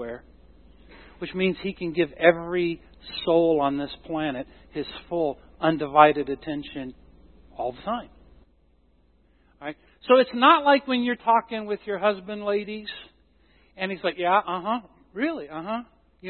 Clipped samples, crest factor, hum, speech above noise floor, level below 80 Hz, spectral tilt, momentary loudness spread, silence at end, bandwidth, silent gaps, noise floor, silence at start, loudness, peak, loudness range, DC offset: under 0.1%; 24 dB; none; 38 dB; -56 dBFS; -9.5 dB/octave; 19 LU; 0 s; 4.4 kHz; none; -62 dBFS; 0 s; -24 LUFS; 0 dBFS; 7 LU; under 0.1%